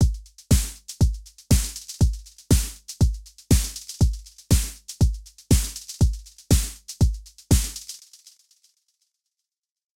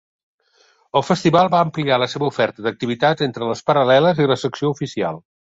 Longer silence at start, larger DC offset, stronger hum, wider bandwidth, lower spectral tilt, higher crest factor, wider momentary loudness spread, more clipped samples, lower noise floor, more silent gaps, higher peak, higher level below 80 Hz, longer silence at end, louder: second, 0 s vs 0.95 s; first, 0.2% vs under 0.1%; neither; first, 16.5 kHz vs 8 kHz; about the same, -5 dB/octave vs -6 dB/octave; about the same, 18 dB vs 16 dB; first, 16 LU vs 9 LU; neither; first, -85 dBFS vs -58 dBFS; neither; second, -6 dBFS vs -2 dBFS; first, -28 dBFS vs -58 dBFS; first, 2.05 s vs 0.3 s; second, -24 LUFS vs -18 LUFS